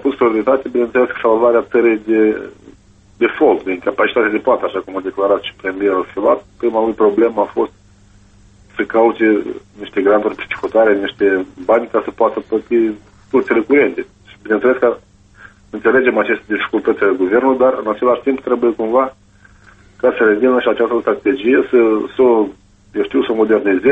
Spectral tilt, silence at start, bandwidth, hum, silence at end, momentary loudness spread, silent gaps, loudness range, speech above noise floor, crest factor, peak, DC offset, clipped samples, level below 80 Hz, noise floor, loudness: -7 dB/octave; 0 s; 4.5 kHz; none; 0 s; 8 LU; none; 2 LU; 32 dB; 14 dB; -2 dBFS; under 0.1%; under 0.1%; -52 dBFS; -46 dBFS; -15 LUFS